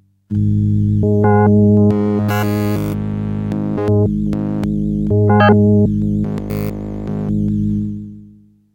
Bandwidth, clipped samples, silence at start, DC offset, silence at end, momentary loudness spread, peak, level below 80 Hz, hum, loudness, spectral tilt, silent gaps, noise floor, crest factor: 16.5 kHz; under 0.1%; 0.3 s; under 0.1%; 0.5 s; 11 LU; 0 dBFS; -34 dBFS; none; -16 LUFS; -9 dB/octave; none; -45 dBFS; 14 dB